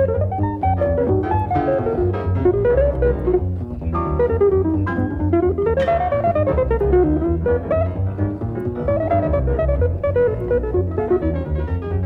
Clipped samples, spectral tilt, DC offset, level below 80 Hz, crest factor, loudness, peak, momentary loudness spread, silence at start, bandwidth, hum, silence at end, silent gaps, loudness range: under 0.1%; -11 dB/octave; under 0.1%; -28 dBFS; 14 dB; -19 LUFS; -6 dBFS; 6 LU; 0 s; 4.3 kHz; none; 0 s; none; 2 LU